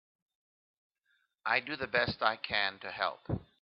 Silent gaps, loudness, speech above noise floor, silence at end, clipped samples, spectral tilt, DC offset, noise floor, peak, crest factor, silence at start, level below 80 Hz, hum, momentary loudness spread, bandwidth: none; -33 LUFS; 43 dB; 0.2 s; under 0.1%; -1.5 dB/octave; under 0.1%; -77 dBFS; -10 dBFS; 26 dB; 1.45 s; -62 dBFS; none; 9 LU; 5.8 kHz